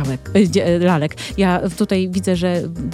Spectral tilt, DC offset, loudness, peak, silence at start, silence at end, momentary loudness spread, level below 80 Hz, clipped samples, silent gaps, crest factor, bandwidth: -6.5 dB/octave; under 0.1%; -17 LUFS; -2 dBFS; 0 s; 0 s; 5 LU; -40 dBFS; under 0.1%; none; 14 dB; 13.5 kHz